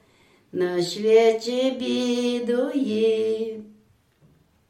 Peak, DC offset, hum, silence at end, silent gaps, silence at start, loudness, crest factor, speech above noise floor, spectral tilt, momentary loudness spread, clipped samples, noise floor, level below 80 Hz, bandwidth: -6 dBFS; under 0.1%; none; 1 s; none; 0.55 s; -23 LUFS; 18 dB; 37 dB; -5 dB/octave; 11 LU; under 0.1%; -59 dBFS; -72 dBFS; 12.5 kHz